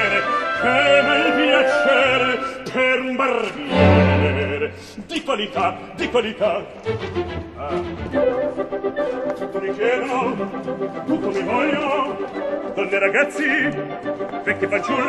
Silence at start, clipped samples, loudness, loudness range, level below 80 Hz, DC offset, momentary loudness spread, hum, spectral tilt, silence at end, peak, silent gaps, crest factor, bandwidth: 0 s; under 0.1%; -20 LUFS; 7 LU; -48 dBFS; under 0.1%; 11 LU; none; -6 dB/octave; 0 s; -2 dBFS; none; 18 dB; 12 kHz